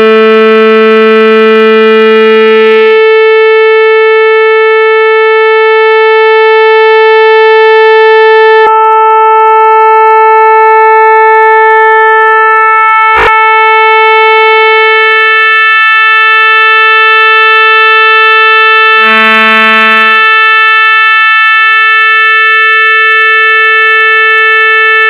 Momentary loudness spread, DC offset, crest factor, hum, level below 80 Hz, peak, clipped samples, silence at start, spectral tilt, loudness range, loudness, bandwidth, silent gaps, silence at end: 2 LU; under 0.1%; 4 dB; none; -46 dBFS; 0 dBFS; 4%; 0 s; -4 dB/octave; 2 LU; -3 LUFS; 5.6 kHz; none; 0 s